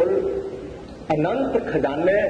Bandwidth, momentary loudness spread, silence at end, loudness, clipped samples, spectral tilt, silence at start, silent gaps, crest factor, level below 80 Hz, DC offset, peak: 9.6 kHz; 14 LU; 0 s; -23 LUFS; under 0.1%; -7.5 dB/octave; 0 s; none; 14 dB; -46 dBFS; under 0.1%; -8 dBFS